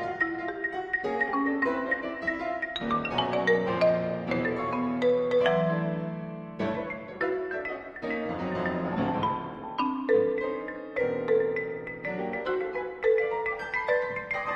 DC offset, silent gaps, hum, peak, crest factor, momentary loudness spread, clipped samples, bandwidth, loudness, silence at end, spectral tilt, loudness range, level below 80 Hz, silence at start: under 0.1%; none; none; -10 dBFS; 18 dB; 9 LU; under 0.1%; 7.2 kHz; -29 LUFS; 0 s; -7 dB/octave; 5 LU; -58 dBFS; 0 s